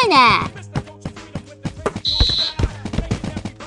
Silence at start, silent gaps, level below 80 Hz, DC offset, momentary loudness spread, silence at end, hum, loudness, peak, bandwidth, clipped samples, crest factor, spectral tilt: 0 s; none; -30 dBFS; under 0.1%; 20 LU; 0 s; none; -19 LUFS; 0 dBFS; 11.5 kHz; under 0.1%; 18 dB; -4.5 dB/octave